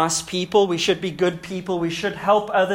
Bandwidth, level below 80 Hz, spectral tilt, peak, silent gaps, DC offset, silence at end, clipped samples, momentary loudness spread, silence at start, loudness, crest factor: 16 kHz; -54 dBFS; -4 dB/octave; -4 dBFS; none; under 0.1%; 0 s; under 0.1%; 6 LU; 0 s; -21 LUFS; 16 dB